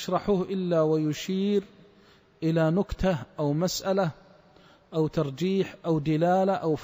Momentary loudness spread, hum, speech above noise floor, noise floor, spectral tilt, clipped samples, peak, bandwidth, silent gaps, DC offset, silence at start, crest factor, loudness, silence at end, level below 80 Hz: 5 LU; none; 32 dB; -58 dBFS; -6.5 dB/octave; under 0.1%; -12 dBFS; 16 kHz; none; under 0.1%; 0 s; 14 dB; -27 LUFS; 0 s; -50 dBFS